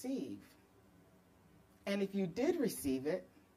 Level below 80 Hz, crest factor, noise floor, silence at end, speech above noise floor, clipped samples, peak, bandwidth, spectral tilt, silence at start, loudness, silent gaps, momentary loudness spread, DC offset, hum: -70 dBFS; 18 dB; -66 dBFS; 0.3 s; 28 dB; under 0.1%; -22 dBFS; 15.5 kHz; -5.5 dB/octave; 0 s; -39 LUFS; none; 13 LU; under 0.1%; none